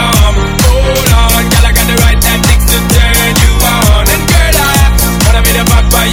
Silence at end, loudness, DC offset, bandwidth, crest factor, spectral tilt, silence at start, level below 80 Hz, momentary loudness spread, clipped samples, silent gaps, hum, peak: 0 s; -8 LUFS; under 0.1%; over 20 kHz; 6 dB; -4 dB/octave; 0 s; -10 dBFS; 2 LU; 3%; none; none; 0 dBFS